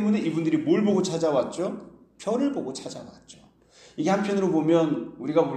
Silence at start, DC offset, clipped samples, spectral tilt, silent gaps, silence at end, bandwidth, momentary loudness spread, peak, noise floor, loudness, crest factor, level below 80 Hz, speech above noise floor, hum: 0 s; under 0.1%; under 0.1%; -6.5 dB/octave; none; 0 s; 9.6 kHz; 16 LU; -8 dBFS; -54 dBFS; -25 LUFS; 16 dB; -66 dBFS; 30 dB; none